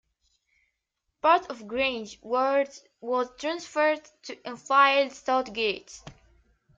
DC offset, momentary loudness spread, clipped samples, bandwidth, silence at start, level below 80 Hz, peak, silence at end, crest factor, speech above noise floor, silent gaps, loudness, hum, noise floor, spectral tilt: under 0.1%; 18 LU; under 0.1%; 7.8 kHz; 1.25 s; -64 dBFS; -8 dBFS; 0.65 s; 20 dB; 54 dB; none; -26 LUFS; none; -81 dBFS; -2.5 dB/octave